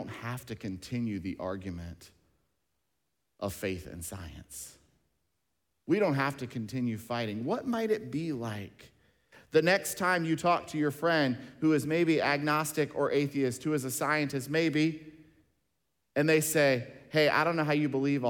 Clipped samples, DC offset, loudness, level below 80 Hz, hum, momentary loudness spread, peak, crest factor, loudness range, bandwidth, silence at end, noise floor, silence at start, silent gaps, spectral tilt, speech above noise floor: under 0.1%; under 0.1%; -30 LUFS; -62 dBFS; none; 15 LU; -12 dBFS; 20 dB; 12 LU; 18 kHz; 0 s; -82 dBFS; 0 s; none; -5 dB/octave; 52 dB